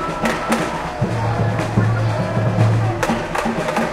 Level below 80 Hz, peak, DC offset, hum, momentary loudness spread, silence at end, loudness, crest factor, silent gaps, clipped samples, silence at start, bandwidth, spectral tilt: -38 dBFS; -2 dBFS; under 0.1%; none; 4 LU; 0 s; -19 LUFS; 16 dB; none; under 0.1%; 0 s; 13.5 kHz; -6.5 dB/octave